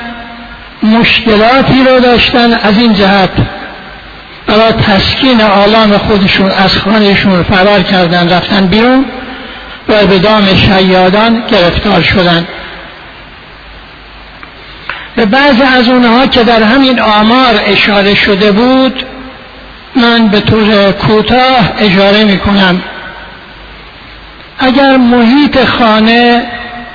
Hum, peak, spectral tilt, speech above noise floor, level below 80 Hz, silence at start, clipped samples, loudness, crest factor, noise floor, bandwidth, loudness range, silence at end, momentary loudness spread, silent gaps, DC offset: none; 0 dBFS; -7 dB/octave; 24 dB; -30 dBFS; 0 s; 0.9%; -6 LUFS; 8 dB; -30 dBFS; 5.4 kHz; 4 LU; 0 s; 17 LU; none; under 0.1%